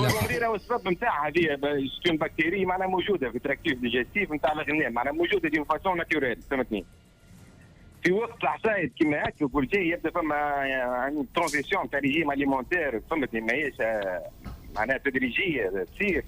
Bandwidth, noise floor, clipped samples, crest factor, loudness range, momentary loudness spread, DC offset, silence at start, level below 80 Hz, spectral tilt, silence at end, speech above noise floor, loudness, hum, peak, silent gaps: 15.5 kHz; -52 dBFS; under 0.1%; 16 dB; 2 LU; 4 LU; under 0.1%; 0 s; -50 dBFS; -5.5 dB/octave; 0 s; 25 dB; -27 LUFS; none; -12 dBFS; none